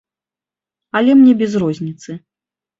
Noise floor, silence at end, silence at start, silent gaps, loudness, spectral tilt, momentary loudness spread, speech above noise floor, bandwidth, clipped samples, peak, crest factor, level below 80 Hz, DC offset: -89 dBFS; 0.6 s; 0.95 s; none; -13 LUFS; -7 dB/octave; 22 LU; 76 dB; 7.6 kHz; under 0.1%; -2 dBFS; 14 dB; -58 dBFS; under 0.1%